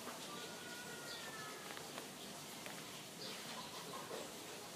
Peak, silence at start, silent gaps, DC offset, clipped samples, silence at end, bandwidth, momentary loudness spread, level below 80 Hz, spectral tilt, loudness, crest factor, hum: -30 dBFS; 0 s; none; under 0.1%; under 0.1%; 0 s; 15.5 kHz; 2 LU; -82 dBFS; -2 dB/octave; -48 LUFS; 20 dB; none